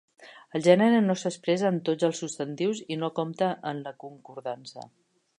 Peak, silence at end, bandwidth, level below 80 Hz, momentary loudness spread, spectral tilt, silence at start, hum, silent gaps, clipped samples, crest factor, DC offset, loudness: -6 dBFS; 0.55 s; 11 kHz; -78 dBFS; 19 LU; -5.5 dB/octave; 0.2 s; none; none; under 0.1%; 22 dB; under 0.1%; -27 LUFS